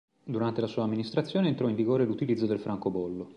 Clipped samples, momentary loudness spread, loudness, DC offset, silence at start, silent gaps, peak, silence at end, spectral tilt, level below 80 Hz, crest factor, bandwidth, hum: under 0.1%; 5 LU; -29 LUFS; under 0.1%; 0.25 s; none; -14 dBFS; 0.05 s; -8.5 dB/octave; -66 dBFS; 16 dB; 9.2 kHz; none